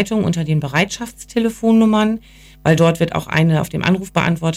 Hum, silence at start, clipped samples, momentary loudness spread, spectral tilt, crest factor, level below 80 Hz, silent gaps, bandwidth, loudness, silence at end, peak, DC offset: none; 0 s; under 0.1%; 7 LU; -6 dB/octave; 14 dB; -44 dBFS; none; 15.5 kHz; -17 LUFS; 0 s; -2 dBFS; under 0.1%